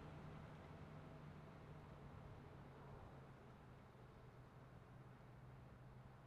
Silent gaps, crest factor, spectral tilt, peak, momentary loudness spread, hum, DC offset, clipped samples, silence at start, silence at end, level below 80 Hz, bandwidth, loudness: none; 12 dB; -7.5 dB/octave; -46 dBFS; 5 LU; none; under 0.1%; under 0.1%; 0 s; 0 s; -70 dBFS; 11 kHz; -61 LUFS